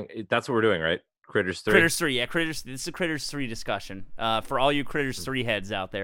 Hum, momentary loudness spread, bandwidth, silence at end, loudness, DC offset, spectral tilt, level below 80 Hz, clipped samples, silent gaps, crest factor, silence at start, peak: none; 11 LU; 17 kHz; 0 s; -26 LUFS; under 0.1%; -4 dB/octave; -48 dBFS; under 0.1%; 1.18-1.22 s; 22 dB; 0 s; -4 dBFS